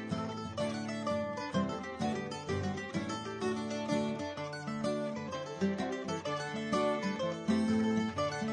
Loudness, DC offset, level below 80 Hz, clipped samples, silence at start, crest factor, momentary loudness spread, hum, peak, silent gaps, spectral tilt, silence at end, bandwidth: -35 LUFS; under 0.1%; -68 dBFS; under 0.1%; 0 s; 16 dB; 7 LU; none; -18 dBFS; none; -5.5 dB/octave; 0 s; 10 kHz